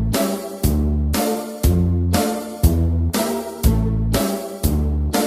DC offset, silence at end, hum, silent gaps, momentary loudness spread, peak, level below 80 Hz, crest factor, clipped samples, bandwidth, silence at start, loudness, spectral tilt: under 0.1%; 0 s; none; none; 5 LU; 0 dBFS; -24 dBFS; 18 dB; under 0.1%; 15.5 kHz; 0 s; -20 LUFS; -6 dB/octave